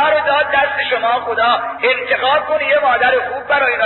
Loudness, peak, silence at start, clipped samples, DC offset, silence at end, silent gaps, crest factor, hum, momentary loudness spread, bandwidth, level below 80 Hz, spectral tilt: -14 LUFS; -2 dBFS; 0 s; under 0.1%; under 0.1%; 0 s; none; 12 dB; none; 3 LU; 4.3 kHz; -52 dBFS; -6 dB/octave